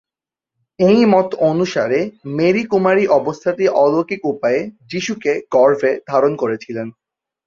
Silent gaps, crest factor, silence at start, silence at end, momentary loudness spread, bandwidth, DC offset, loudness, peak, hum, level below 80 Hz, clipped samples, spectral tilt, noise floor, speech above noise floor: none; 16 dB; 0.8 s; 0.55 s; 10 LU; 7.4 kHz; under 0.1%; -16 LUFS; -2 dBFS; none; -60 dBFS; under 0.1%; -6.5 dB/octave; -88 dBFS; 73 dB